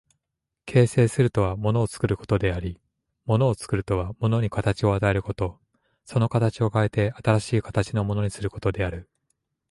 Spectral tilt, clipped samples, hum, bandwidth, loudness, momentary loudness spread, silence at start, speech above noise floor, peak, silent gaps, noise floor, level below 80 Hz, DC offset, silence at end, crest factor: -7 dB/octave; under 0.1%; none; 11.5 kHz; -24 LUFS; 9 LU; 0.65 s; 61 dB; -6 dBFS; none; -84 dBFS; -42 dBFS; under 0.1%; 0.7 s; 18 dB